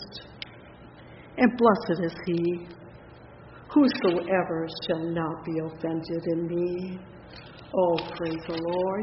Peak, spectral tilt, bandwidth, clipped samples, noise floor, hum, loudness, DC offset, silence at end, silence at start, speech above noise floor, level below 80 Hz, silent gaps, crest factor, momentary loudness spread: -6 dBFS; -5 dB/octave; 5.8 kHz; under 0.1%; -48 dBFS; none; -27 LUFS; under 0.1%; 0 s; 0 s; 22 dB; -58 dBFS; none; 22 dB; 23 LU